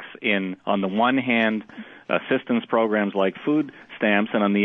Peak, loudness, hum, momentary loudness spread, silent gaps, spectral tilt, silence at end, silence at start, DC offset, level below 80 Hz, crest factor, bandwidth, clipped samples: -6 dBFS; -23 LUFS; none; 6 LU; none; -8.5 dB/octave; 0 s; 0 s; under 0.1%; -72 dBFS; 16 dB; 4 kHz; under 0.1%